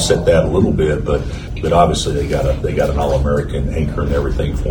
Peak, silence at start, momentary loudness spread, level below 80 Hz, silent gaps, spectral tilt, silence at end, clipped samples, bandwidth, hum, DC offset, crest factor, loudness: 0 dBFS; 0 s; 7 LU; -22 dBFS; none; -6 dB/octave; 0 s; under 0.1%; 18.5 kHz; none; under 0.1%; 16 dB; -16 LUFS